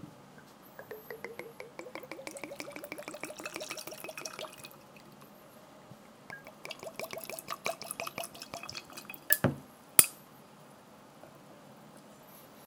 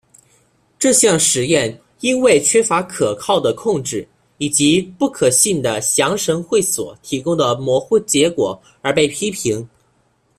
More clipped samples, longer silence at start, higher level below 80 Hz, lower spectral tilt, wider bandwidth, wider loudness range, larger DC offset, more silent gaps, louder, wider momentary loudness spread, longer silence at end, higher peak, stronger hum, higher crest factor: neither; second, 0 s vs 0.8 s; second, -74 dBFS vs -54 dBFS; about the same, -2 dB/octave vs -3 dB/octave; first, 18 kHz vs 15.5 kHz; first, 15 LU vs 3 LU; neither; neither; second, -34 LUFS vs -16 LUFS; first, 26 LU vs 10 LU; second, 0 s vs 0.7 s; about the same, 0 dBFS vs 0 dBFS; neither; first, 38 dB vs 18 dB